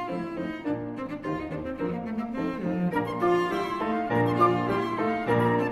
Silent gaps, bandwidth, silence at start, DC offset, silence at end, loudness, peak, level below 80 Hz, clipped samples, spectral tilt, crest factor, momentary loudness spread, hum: none; 13.5 kHz; 0 s; under 0.1%; 0 s; -28 LUFS; -10 dBFS; -54 dBFS; under 0.1%; -7.5 dB/octave; 18 dB; 9 LU; none